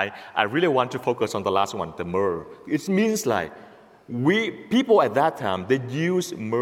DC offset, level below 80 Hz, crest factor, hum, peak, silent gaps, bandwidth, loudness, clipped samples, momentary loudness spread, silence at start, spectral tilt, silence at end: under 0.1%; -62 dBFS; 20 dB; none; -4 dBFS; none; 16.5 kHz; -23 LUFS; under 0.1%; 9 LU; 0 s; -5.5 dB/octave; 0 s